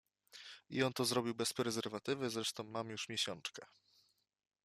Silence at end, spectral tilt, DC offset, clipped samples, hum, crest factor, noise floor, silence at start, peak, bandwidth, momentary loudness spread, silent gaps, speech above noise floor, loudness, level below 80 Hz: 1 s; -3.5 dB/octave; under 0.1%; under 0.1%; none; 20 dB; -76 dBFS; 0.35 s; -22 dBFS; 15 kHz; 17 LU; none; 36 dB; -39 LUFS; -80 dBFS